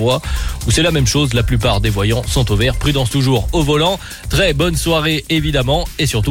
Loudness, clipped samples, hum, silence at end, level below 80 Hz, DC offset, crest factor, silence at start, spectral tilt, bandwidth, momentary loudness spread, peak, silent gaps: -15 LUFS; under 0.1%; none; 0 s; -24 dBFS; under 0.1%; 12 dB; 0 s; -4.5 dB/octave; 17 kHz; 4 LU; -4 dBFS; none